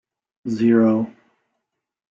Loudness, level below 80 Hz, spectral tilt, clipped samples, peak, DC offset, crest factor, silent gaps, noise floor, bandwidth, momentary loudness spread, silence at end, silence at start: -19 LUFS; -64 dBFS; -8.5 dB/octave; under 0.1%; -6 dBFS; under 0.1%; 16 dB; none; -80 dBFS; 7.2 kHz; 16 LU; 1 s; 0.45 s